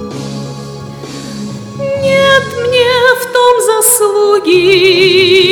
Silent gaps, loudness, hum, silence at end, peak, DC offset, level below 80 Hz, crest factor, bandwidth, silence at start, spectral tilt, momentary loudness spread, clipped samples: none; -8 LUFS; none; 0 s; 0 dBFS; under 0.1%; -46 dBFS; 10 dB; over 20 kHz; 0 s; -3 dB/octave; 17 LU; 0.4%